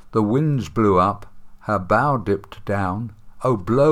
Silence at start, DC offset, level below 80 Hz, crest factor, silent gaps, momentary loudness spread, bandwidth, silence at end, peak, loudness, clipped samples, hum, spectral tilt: 0.05 s; under 0.1%; -46 dBFS; 16 dB; none; 11 LU; 13 kHz; 0 s; -4 dBFS; -21 LUFS; under 0.1%; none; -8.5 dB/octave